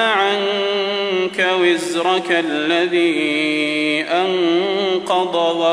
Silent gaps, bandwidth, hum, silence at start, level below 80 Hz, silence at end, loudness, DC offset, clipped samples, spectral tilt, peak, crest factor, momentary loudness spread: none; 11 kHz; none; 0 s; -66 dBFS; 0 s; -17 LUFS; under 0.1%; under 0.1%; -3.5 dB/octave; -4 dBFS; 14 dB; 3 LU